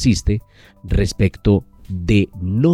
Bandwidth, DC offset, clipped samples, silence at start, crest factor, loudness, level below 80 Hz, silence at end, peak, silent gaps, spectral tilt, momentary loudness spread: 12.5 kHz; under 0.1%; under 0.1%; 0 s; 14 dB; -19 LUFS; -28 dBFS; 0 s; -2 dBFS; none; -6.5 dB/octave; 8 LU